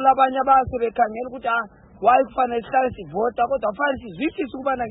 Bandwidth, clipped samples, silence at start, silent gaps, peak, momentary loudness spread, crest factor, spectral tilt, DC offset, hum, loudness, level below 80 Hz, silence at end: 4 kHz; under 0.1%; 0 s; none; -4 dBFS; 8 LU; 16 dB; -10 dB/octave; under 0.1%; none; -21 LUFS; -50 dBFS; 0 s